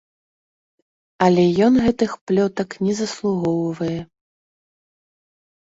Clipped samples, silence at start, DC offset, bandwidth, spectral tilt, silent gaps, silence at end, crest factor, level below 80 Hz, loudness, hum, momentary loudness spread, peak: under 0.1%; 1.2 s; under 0.1%; 8 kHz; -6.5 dB/octave; 2.21-2.27 s; 1.65 s; 20 dB; -52 dBFS; -19 LUFS; none; 9 LU; -2 dBFS